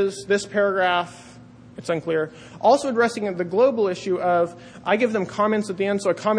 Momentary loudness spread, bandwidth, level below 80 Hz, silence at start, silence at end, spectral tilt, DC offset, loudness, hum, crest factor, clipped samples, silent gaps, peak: 8 LU; 10.5 kHz; -62 dBFS; 0 s; 0 s; -5 dB/octave; under 0.1%; -22 LUFS; none; 16 dB; under 0.1%; none; -6 dBFS